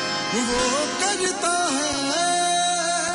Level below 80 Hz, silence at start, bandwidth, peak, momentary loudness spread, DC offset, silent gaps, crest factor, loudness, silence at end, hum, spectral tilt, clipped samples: -50 dBFS; 0 s; 11 kHz; -10 dBFS; 2 LU; under 0.1%; none; 12 dB; -21 LUFS; 0 s; none; -1.5 dB/octave; under 0.1%